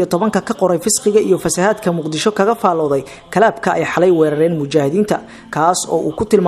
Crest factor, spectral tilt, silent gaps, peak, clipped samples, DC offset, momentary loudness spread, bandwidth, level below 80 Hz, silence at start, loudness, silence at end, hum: 14 dB; -4.5 dB/octave; none; 0 dBFS; under 0.1%; under 0.1%; 5 LU; 15 kHz; -50 dBFS; 0 s; -15 LUFS; 0 s; none